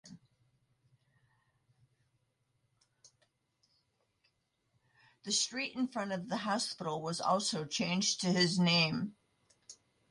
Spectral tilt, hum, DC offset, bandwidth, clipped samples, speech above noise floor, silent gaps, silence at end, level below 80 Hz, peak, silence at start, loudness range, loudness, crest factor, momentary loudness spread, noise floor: -3.5 dB/octave; none; under 0.1%; 11.5 kHz; under 0.1%; 45 dB; none; 0.35 s; -76 dBFS; -18 dBFS; 0.05 s; 8 LU; -33 LUFS; 20 dB; 10 LU; -79 dBFS